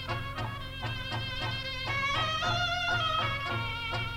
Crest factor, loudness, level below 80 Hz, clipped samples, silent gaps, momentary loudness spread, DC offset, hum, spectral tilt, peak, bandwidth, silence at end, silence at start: 14 dB; -31 LUFS; -46 dBFS; under 0.1%; none; 8 LU; under 0.1%; none; -4 dB/octave; -18 dBFS; 16 kHz; 0 s; 0 s